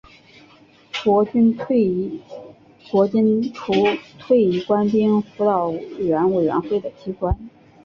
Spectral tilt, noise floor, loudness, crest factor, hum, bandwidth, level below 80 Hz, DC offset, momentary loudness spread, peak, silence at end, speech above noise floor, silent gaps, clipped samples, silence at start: -8 dB/octave; -50 dBFS; -20 LUFS; 16 dB; none; 7 kHz; -40 dBFS; under 0.1%; 12 LU; -4 dBFS; 0.35 s; 32 dB; none; under 0.1%; 0.95 s